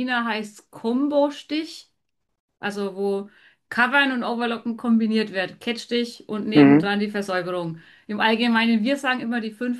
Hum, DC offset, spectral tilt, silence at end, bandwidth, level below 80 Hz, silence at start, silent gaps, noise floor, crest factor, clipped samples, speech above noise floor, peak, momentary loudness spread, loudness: none; under 0.1%; -5.5 dB/octave; 0 s; 12.5 kHz; -70 dBFS; 0 s; 2.40-2.48 s; -78 dBFS; 20 dB; under 0.1%; 56 dB; -2 dBFS; 13 LU; -22 LUFS